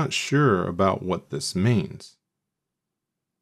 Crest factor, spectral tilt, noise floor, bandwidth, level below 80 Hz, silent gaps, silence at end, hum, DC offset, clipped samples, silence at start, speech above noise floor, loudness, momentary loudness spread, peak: 20 dB; -5.5 dB/octave; -84 dBFS; 14 kHz; -60 dBFS; none; 1.35 s; none; under 0.1%; under 0.1%; 0 s; 60 dB; -23 LUFS; 9 LU; -6 dBFS